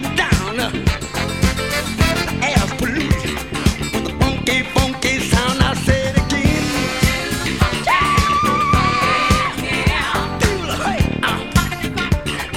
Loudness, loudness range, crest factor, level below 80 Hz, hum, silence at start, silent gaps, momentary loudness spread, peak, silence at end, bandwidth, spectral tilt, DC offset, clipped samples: -17 LUFS; 3 LU; 16 dB; -26 dBFS; none; 0 s; none; 5 LU; 0 dBFS; 0 s; 17 kHz; -4.5 dB/octave; 0.5%; under 0.1%